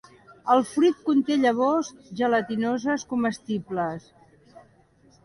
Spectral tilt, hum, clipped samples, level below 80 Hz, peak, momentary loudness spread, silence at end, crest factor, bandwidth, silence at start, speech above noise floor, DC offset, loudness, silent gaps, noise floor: -5.5 dB/octave; none; under 0.1%; -66 dBFS; -6 dBFS; 10 LU; 1.25 s; 18 dB; 11.5 kHz; 0.3 s; 35 dB; under 0.1%; -24 LUFS; none; -58 dBFS